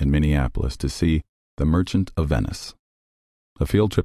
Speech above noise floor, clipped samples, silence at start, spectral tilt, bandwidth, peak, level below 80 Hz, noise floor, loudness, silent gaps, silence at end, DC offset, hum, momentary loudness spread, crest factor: over 69 dB; under 0.1%; 0 s; -7 dB/octave; 14 kHz; -6 dBFS; -28 dBFS; under -90 dBFS; -23 LUFS; 1.29-1.57 s, 2.79-3.56 s; 0 s; under 0.1%; none; 9 LU; 16 dB